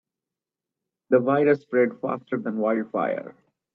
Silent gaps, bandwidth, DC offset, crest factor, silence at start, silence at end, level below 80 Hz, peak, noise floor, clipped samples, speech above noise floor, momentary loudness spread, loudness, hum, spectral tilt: none; 5.8 kHz; under 0.1%; 20 dB; 1.1 s; 0.45 s; -74 dBFS; -6 dBFS; -89 dBFS; under 0.1%; 65 dB; 9 LU; -24 LUFS; none; -9.5 dB/octave